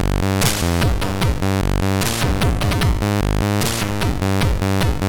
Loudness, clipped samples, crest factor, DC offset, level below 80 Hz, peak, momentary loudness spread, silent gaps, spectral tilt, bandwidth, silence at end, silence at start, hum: -19 LUFS; under 0.1%; 12 dB; under 0.1%; -24 dBFS; -6 dBFS; 3 LU; none; -5 dB/octave; 19 kHz; 0 s; 0 s; none